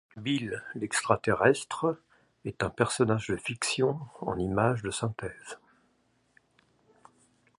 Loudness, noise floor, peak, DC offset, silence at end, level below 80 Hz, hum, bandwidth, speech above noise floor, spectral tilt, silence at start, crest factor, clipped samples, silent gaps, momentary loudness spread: -29 LUFS; -70 dBFS; -6 dBFS; under 0.1%; 2.05 s; -58 dBFS; none; 11.5 kHz; 41 dB; -4.5 dB/octave; 0.15 s; 24 dB; under 0.1%; none; 16 LU